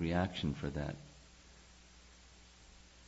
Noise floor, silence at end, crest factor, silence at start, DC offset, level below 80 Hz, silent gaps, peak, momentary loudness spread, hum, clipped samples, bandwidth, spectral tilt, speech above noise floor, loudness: -60 dBFS; 0 s; 20 dB; 0 s; under 0.1%; -56 dBFS; none; -20 dBFS; 23 LU; none; under 0.1%; 7.6 kHz; -5.5 dB/octave; 23 dB; -39 LUFS